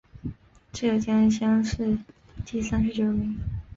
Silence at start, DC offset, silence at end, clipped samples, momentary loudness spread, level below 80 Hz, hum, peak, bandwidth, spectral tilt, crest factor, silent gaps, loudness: 0.15 s; under 0.1%; 0 s; under 0.1%; 18 LU; -42 dBFS; none; -14 dBFS; 7.6 kHz; -6.5 dB/octave; 12 dB; none; -25 LUFS